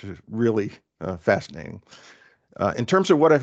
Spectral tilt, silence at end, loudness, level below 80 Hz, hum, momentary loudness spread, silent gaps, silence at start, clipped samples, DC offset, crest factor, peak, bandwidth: -6.5 dB/octave; 0 s; -23 LUFS; -62 dBFS; none; 20 LU; none; 0.05 s; under 0.1%; under 0.1%; 18 dB; -6 dBFS; 8.2 kHz